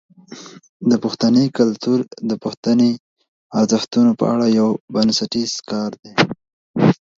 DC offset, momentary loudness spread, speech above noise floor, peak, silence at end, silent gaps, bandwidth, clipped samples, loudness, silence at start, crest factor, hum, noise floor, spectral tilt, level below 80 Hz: under 0.1%; 9 LU; 22 dB; 0 dBFS; 0.25 s; 0.69-0.80 s, 2.57-2.63 s, 3.00-3.16 s, 3.28-3.50 s, 4.80-4.88 s, 5.99-6.03 s, 6.53-6.74 s; 7.6 kHz; under 0.1%; -18 LUFS; 0.3 s; 18 dB; none; -39 dBFS; -5.5 dB/octave; -60 dBFS